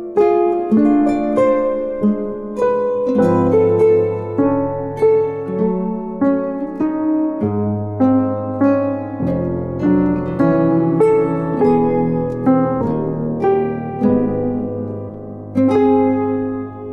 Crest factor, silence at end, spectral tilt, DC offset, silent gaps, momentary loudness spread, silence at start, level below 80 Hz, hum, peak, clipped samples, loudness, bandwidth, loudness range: 12 dB; 0 s; -10 dB/octave; under 0.1%; none; 8 LU; 0 s; -44 dBFS; none; -4 dBFS; under 0.1%; -17 LUFS; 7.2 kHz; 3 LU